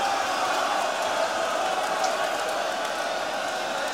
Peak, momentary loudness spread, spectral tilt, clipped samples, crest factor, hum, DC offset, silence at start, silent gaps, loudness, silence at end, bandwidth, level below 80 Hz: -12 dBFS; 3 LU; -1 dB/octave; under 0.1%; 14 dB; none; 0.1%; 0 s; none; -26 LUFS; 0 s; 16.5 kHz; -72 dBFS